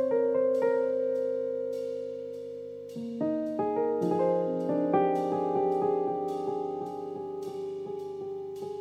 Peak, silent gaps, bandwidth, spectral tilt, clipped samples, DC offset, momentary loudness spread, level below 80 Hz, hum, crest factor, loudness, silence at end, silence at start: -14 dBFS; none; 9.6 kHz; -8 dB/octave; under 0.1%; under 0.1%; 12 LU; -80 dBFS; 50 Hz at -60 dBFS; 16 dB; -30 LUFS; 0 s; 0 s